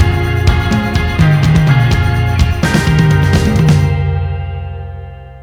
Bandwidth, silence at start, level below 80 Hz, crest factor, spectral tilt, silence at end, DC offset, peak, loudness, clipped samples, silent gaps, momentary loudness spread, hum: 15.5 kHz; 0 s; -20 dBFS; 12 dB; -6.5 dB/octave; 0 s; under 0.1%; 0 dBFS; -12 LUFS; under 0.1%; none; 14 LU; none